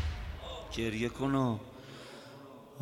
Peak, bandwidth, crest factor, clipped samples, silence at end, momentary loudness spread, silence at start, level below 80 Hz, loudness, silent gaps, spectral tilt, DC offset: -20 dBFS; 16 kHz; 18 dB; under 0.1%; 0 s; 19 LU; 0 s; -46 dBFS; -35 LUFS; none; -6 dB/octave; under 0.1%